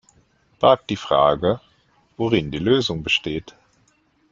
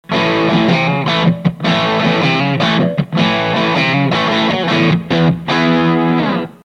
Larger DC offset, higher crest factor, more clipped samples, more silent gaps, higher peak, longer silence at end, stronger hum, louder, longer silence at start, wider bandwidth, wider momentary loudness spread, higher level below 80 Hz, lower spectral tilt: neither; first, 20 dB vs 14 dB; neither; neither; about the same, -2 dBFS vs 0 dBFS; first, 0.8 s vs 0.1 s; neither; second, -20 LUFS vs -14 LUFS; first, 0.6 s vs 0.1 s; about the same, 7.6 kHz vs 7.8 kHz; first, 10 LU vs 2 LU; about the same, -50 dBFS vs -46 dBFS; about the same, -5.5 dB/octave vs -6.5 dB/octave